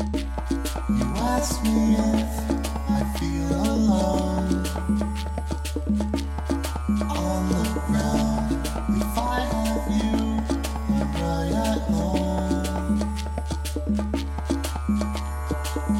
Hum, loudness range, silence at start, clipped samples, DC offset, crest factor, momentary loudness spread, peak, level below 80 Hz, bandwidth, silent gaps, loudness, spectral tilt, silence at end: none; 3 LU; 0 s; under 0.1%; under 0.1%; 16 dB; 7 LU; -8 dBFS; -30 dBFS; 16.5 kHz; none; -25 LUFS; -6 dB/octave; 0 s